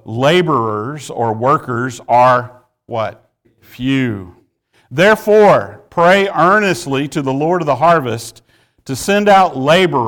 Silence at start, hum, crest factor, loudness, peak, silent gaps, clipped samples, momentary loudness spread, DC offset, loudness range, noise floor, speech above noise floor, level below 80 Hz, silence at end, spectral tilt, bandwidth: 0.05 s; none; 12 dB; -13 LUFS; -2 dBFS; none; under 0.1%; 14 LU; under 0.1%; 4 LU; -57 dBFS; 44 dB; -50 dBFS; 0 s; -5.5 dB/octave; over 20 kHz